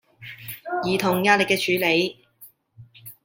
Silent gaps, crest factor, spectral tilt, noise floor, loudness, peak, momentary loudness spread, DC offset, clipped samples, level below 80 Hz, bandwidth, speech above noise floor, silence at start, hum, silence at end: none; 22 dB; -4 dB/octave; -52 dBFS; -21 LUFS; -2 dBFS; 22 LU; under 0.1%; under 0.1%; -66 dBFS; 17 kHz; 31 dB; 0.2 s; none; 0.1 s